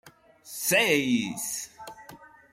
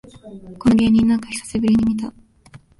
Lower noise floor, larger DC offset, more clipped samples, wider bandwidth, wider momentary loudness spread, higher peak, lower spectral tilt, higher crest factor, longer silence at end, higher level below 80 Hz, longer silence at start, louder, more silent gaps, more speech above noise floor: about the same, -50 dBFS vs -47 dBFS; neither; neither; first, 16.5 kHz vs 11.5 kHz; first, 23 LU vs 13 LU; about the same, -8 dBFS vs -6 dBFS; second, -2.5 dB/octave vs -6 dB/octave; first, 20 dB vs 14 dB; about the same, 0.25 s vs 0.2 s; second, -68 dBFS vs -42 dBFS; second, 0.05 s vs 0.25 s; second, -25 LUFS vs -18 LUFS; neither; second, 24 dB vs 29 dB